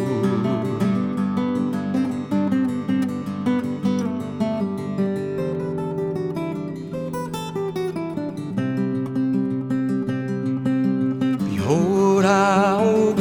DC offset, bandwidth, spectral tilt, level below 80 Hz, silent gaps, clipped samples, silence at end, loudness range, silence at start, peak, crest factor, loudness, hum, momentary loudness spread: under 0.1%; 15.5 kHz; -7 dB/octave; -58 dBFS; none; under 0.1%; 0 s; 6 LU; 0 s; -4 dBFS; 18 dB; -22 LUFS; none; 10 LU